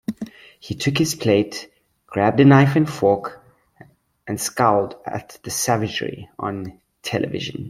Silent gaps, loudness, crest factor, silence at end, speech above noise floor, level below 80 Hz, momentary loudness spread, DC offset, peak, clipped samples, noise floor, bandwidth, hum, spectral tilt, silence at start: none; -20 LUFS; 18 dB; 0 s; 31 dB; -56 dBFS; 19 LU; under 0.1%; -2 dBFS; under 0.1%; -50 dBFS; 15.5 kHz; none; -5.5 dB/octave; 0.1 s